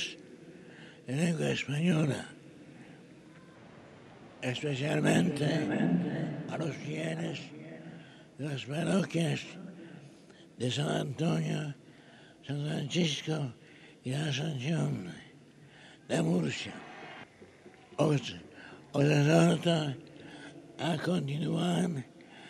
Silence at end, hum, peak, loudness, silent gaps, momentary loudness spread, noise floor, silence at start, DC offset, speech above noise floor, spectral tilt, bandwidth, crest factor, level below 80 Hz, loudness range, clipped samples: 0 s; none; -12 dBFS; -32 LUFS; none; 23 LU; -56 dBFS; 0 s; under 0.1%; 25 dB; -6 dB/octave; 13 kHz; 22 dB; -70 dBFS; 6 LU; under 0.1%